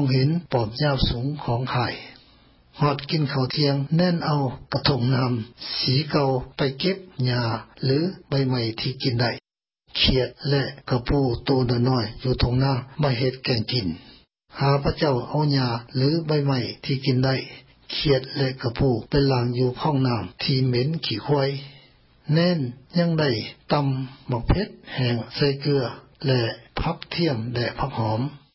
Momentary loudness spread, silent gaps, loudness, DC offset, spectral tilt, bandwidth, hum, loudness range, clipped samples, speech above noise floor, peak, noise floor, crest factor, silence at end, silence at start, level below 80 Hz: 7 LU; none; -24 LUFS; under 0.1%; -10 dB/octave; 5.8 kHz; none; 2 LU; under 0.1%; 38 dB; -6 dBFS; -61 dBFS; 18 dB; 0.2 s; 0 s; -40 dBFS